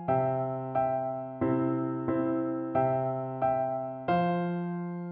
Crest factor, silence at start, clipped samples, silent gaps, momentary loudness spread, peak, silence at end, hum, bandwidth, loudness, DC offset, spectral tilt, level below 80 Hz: 14 dB; 0 s; under 0.1%; none; 5 LU; -16 dBFS; 0 s; none; 4.5 kHz; -30 LUFS; under 0.1%; -8 dB/octave; -64 dBFS